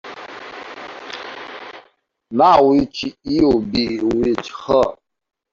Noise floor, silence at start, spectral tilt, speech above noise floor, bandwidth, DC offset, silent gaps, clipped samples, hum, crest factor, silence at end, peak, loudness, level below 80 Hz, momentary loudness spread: -55 dBFS; 0.05 s; -6 dB/octave; 39 dB; 7.6 kHz; under 0.1%; none; under 0.1%; none; 16 dB; 0.6 s; -2 dBFS; -17 LUFS; -46 dBFS; 20 LU